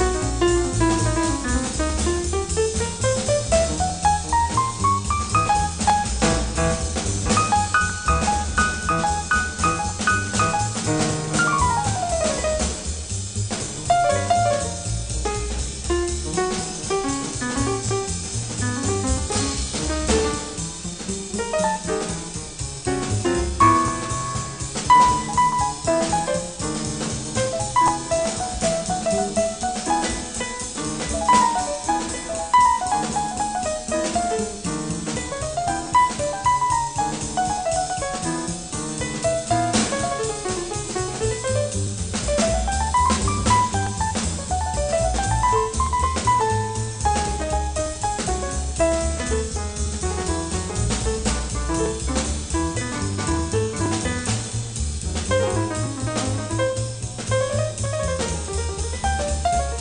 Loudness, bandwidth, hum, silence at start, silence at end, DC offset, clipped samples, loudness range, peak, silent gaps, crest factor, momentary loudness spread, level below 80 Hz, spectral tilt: -22 LUFS; 10 kHz; none; 0 s; 0 s; 0.2%; under 0.1%; 4 LU; -4 dBFS; none; 18 dB; 7 LU; -32 dBFS; -4 dB/octave